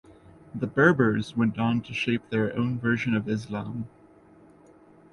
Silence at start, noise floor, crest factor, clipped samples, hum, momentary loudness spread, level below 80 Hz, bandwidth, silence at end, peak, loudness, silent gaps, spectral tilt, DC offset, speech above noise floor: 0.1 s; -54 dBFS; 22 dB; under 0.1%; none; 14 LU; -58 dBFS; 11 kHz; 1.25 s; -4 dBFS; -26 LUFS; none; -7.5 dB/octave; under 0.1%; 29 dB